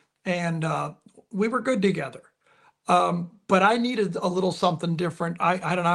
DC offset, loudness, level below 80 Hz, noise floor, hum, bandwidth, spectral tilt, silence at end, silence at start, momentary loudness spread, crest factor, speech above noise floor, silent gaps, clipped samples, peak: under 0.1%; -25 LUFS; -68 dBFS; -61 dBFS; none; 11.5 kHz; -6 dB/octave; 0 s; 0.25 s; 11 LU; 20 dB; 37 dB; none; under 0.1%; -6 dBFS